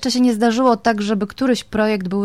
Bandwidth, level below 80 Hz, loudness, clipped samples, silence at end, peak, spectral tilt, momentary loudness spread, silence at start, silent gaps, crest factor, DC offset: 14.5 kHz; -50 dBFS; -18 LUFS; under 0.1%; 0 s; -4 dBFS; -5 dB/octave; 4 LU; 0 s; none; 14 dB; 0.3%